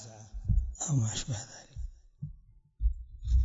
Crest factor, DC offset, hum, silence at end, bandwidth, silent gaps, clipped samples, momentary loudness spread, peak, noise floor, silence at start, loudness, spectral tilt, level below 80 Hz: 16 dB; under 0.1%; none; 0 s; 7.8 kHz; none; under 0.1%; 16 LU; -16 dBFS; -55 dBFS; 0 s; -34 LUFS; -4.5 dB/octave; -34 dBFS